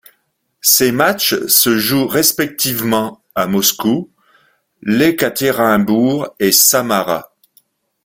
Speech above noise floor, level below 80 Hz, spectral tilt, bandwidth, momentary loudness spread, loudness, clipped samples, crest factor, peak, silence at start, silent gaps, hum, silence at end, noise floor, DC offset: 51 dB; -52 dBFS; -3 dB/octave; 19.5 kHz; 8 LU; -13 LUFS; under 0.1%; 16 dB; 0 dBFS; 0.65 s; none; none; 0.8 s; -65 dBFS; under 0.1%